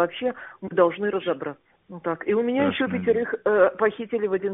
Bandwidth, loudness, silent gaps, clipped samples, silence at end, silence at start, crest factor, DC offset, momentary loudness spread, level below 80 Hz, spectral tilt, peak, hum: 3.9 kHz; -24 LUFS; none; under 0.1%; 0 s; 0 s; 18 dB; under 0.1%; 11 LU; -64 dBFS; -2 dB/octave; -6 dBFS; none